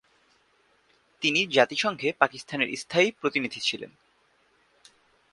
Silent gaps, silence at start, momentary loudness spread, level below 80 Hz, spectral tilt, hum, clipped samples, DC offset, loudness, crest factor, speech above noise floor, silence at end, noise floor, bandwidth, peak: none; 1.2 s; 7 LU; -72 dBFS; -3 dB/octave; none; under 0.1%; under 0.1%; -25 LUFS; 28 dB; 40 dB; 1.45 s; -66 dBFS; 11.5 kHz; -2 dBFS